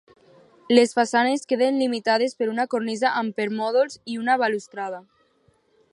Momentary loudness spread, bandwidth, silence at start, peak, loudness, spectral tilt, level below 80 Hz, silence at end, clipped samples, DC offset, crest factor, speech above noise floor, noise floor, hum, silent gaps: 10 LU; 11 kHz; 0.7 s; -2 dBFS; -22 LUFS; -4 dB/octave; -76 dBFS; 0.9 s; under 0.1%; under 0.1%; 22 dB; 41 dB; -63 dBFS; none; none